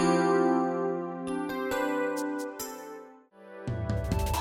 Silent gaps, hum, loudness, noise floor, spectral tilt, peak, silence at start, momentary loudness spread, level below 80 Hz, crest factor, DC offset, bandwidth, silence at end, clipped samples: none; none; -30 LUFS; -51 dBFS; -6 dB/octave; -14 dBFS; 0 s; 17 LU; -44 dBFS; 16 dB; under 0.1%; 19 kHz; 0 s; under 0.1%